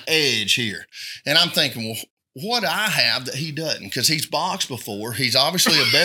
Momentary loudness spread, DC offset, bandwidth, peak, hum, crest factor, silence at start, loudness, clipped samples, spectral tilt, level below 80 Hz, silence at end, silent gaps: 14 LU; under 0.1%; 19 kHz; 0 dBFS; none; 22 dB; 0 s; -19 LUFS; under 0.1%; -2 dB/octave; -70 dBFS; 0 s; 2.10-2.17 s